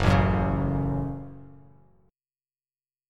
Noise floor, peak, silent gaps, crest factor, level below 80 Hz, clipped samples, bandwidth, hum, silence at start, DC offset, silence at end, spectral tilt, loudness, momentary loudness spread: under -90 dBFS; -6 dBFS; none; 22 dB; -38 dBFS; under 0.1%; 9.8 kHz; none; 0 s; under 0.1%; 1.65 s; -8 dB/octave; -26 LUFS; 21 LU